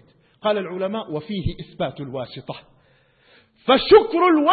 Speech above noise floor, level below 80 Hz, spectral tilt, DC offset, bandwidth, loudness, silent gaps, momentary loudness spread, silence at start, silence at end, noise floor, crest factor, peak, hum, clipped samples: 39 dB; -44 dBFS; -10.5 dB/octave; under 0.1%; 4.8 kHz; -20 LUFS; none; 19 LU; 0.45 s; 0 s; -58 dBFS; 18 dB; -2 dBFS; none; under 0.1%